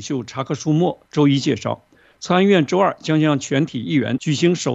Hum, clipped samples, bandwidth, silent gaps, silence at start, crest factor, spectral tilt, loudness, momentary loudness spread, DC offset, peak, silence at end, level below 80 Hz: none; under 0.1%; 8.2 kHz; none; 0 s; 18 dB; -6 dB/octave; -19 LUFS; 10 LU; under 0.1%; -2 dBFS; 0 s; -62 dBFS